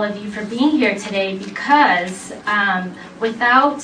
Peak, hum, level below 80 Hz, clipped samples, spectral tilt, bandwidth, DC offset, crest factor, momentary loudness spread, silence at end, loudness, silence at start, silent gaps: 0 dBFS; none; -60 dBFS; under 0.1%; -4.5 dB/octave; 10.5 kHz; under 0.1%; 16 dB; 13 LU; 0 s; -17 LUFS; 0 s; none